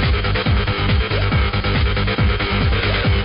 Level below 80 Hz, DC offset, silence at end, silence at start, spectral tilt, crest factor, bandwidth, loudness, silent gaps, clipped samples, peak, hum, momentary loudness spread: -22 dBFS; under 0.1%; 0 s; 0 s; -11 dB/octave; 10 dB; 5.4 kHz; -18 LUFS; none; under 0.1%; -6 dBFS; none; 1 LU